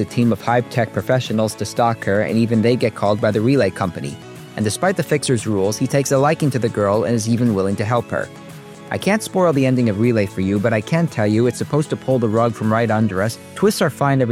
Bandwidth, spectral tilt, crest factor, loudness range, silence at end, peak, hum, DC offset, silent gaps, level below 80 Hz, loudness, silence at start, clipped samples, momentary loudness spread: 16 kHz; -6 dB/octave; 14 dB; 1 LU; 0 s; -4 dBFS; none; under 0.1%; none; -56 dBFS; -18 LUFS; 0 s; under 0.1%; 7 LU